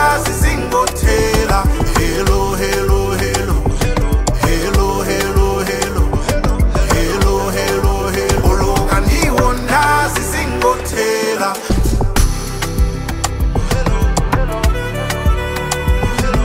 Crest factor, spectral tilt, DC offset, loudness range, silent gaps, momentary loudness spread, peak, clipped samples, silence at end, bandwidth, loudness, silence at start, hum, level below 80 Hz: 14 dB; -5 dB/octave; under 0.1%; 3 LU; none; 4 LU; 0 dBFS; under 0.1%; 0 s; 16.5 kHz; -16 LUFS; 0 s; none; -18 dBFS